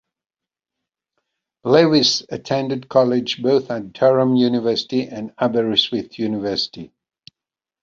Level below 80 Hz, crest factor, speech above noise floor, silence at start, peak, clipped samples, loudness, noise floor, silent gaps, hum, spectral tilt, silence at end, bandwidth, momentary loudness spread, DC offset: -60 dBFS; 18 dB; 70 dB; 1.65 s; -2 dBFS; under 0.1%; -18 LUFS; -89 dBFS; none; none; -5 dB/octave; 0.95 s; 7.6 kHz; 10 LU; under 0.1%